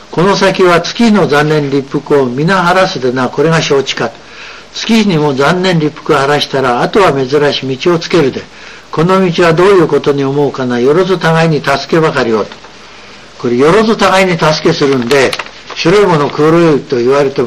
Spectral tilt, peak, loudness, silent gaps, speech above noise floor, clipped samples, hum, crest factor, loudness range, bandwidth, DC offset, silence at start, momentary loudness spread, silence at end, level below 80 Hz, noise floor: -5.5 dB/octave; 0 dBFS; -10 LUFS; none; 24 dB; under 0.1%; none; 10 dB; 2 LU; 13.5 kHz; 0.7%; 0.1 s; 8 LU; 0 s; -40 dBFS; -33 dBFS